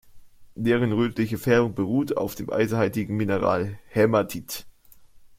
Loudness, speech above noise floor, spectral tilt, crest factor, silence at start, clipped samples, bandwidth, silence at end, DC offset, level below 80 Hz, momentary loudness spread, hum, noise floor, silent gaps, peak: -24 LUFS; 27 dB; -6.5 dB/octave; 20 dB; 0.05 s; under 0.1%; 16.5 kHz; 0.1 s; under 0.1%; -54 dBFS; 7 LU; none; -50 dBFS; none; -6 dBFS